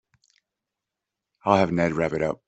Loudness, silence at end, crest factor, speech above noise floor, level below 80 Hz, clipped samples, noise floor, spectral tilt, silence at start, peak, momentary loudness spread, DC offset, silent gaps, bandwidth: -23 LUFS; 0.15 s; 22 dB; 63 dB; -56 dBFS; under 0.1%; -86 dBFS; -7 dB/octave; 1.45 s; -4 dBFS; 6 LU; under 0.1%; none; 8.2 kHz